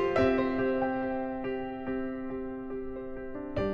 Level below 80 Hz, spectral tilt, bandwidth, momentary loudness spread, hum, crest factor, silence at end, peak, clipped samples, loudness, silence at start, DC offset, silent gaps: -50 dBFS; -8 dB/octave; 6.6 kHz; 12 LU; none; 16 dB; 0 s; -14 dBFS; under 0.1%; -32 LUFS; 0 s; under 0.1%; none